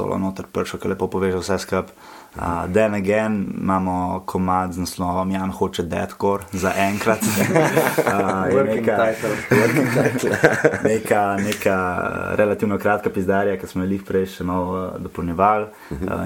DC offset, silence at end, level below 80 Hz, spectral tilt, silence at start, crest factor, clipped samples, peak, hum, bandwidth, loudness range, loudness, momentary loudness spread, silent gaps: under 0.1%; 0 s; -48 dBFS; -5.5 dB/octave; 0 s; 20 dB; under 0.1%; 0 dBFS; none; 17.5 kHz; 4 LU; -20 LUFS; 8 LU; none